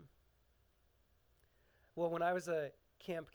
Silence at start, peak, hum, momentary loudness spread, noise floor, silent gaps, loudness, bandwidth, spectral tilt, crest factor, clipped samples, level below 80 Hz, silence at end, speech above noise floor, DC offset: 0 s; -24 dBFS; none; 15 LU; -74 dBFS; none; -40 LUFS; over 20 kHz; -5.5 dB/octave; 18 dB; under 0.1%; -76 dBFS; 0.1 s; 35 dB; under 0.1%